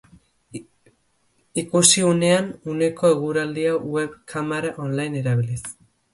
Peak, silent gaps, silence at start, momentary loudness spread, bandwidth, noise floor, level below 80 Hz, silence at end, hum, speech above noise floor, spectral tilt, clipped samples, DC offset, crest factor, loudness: 0 dBFS; none; 0.55 s; 17 LU; 11.5 kHz; -65 dBFS; -58 dBFS; 0.4 s; none; 44 dB; -4 dB/octave; under 0.1%; under 0.1%; 22 dB; -21 LUFS